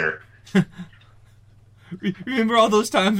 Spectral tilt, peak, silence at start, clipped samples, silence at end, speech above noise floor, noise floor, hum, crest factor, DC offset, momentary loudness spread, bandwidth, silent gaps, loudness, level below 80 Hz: -5 dB/octave; -6 dBFS; 0 s; under 0.1%; 0 s; 31 dB; -51 dBFS; none; 16 dB; under 0.1%; 24 LU; 16 kHz; none; -21 LUFS; -58 dBFS